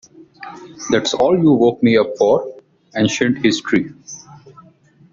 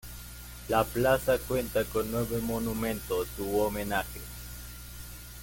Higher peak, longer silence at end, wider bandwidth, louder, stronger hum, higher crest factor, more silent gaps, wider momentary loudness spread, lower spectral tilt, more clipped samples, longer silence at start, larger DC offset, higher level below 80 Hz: first, -2 dBFS vs -12 dBFS; first, 0.75 s vs 0 s; second, 7.8 kHz vs 17 kHz; first, -16 LUFS vs -30 LUFS; second, none vs 60 Hz at -45 dBFS; about the same, 16 dB vs 20 dB; neither; first, 21 LU vs 17 LU; about the same, -5 dB/octave vs -5 dB/octave; neither; first, 0.4 s vs 0.05 s; neither; second, -54 dBFS vs -44 dBFS